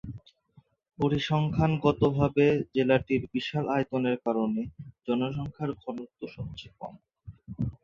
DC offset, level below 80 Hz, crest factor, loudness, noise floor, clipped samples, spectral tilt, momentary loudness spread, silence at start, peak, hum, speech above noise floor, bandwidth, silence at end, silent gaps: under 0.1%; -52 dBFS; 20 dB; -28 LUFS; -62 dBFS; under 0.1%; -8 dB/octave; 17 LU; 0.05 s; -8 dBFS; none; 35 dB; 7.2 kHz; 0.1 s; none